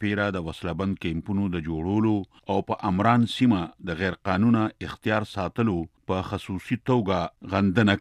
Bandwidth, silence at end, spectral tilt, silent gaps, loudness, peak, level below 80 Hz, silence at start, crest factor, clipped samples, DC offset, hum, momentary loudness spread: 11.5 kHz; 0 s; -7.5 dB/octave; none; -26 LUFS; -6 dBFS; -50 dBFS; 0 s; 18 dB; under 0.1%; under 0.1%; none; 9 LU